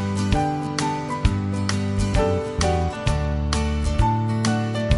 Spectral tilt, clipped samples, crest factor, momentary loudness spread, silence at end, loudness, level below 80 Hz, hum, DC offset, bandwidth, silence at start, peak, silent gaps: -6 dB/octave; under 0.1%; 16 dB; 3 LU; 0 s; -23 LUFS; -28 dBFS; none; under 0.1%; 11.5 kHz; 0 s; -4 dBFS; none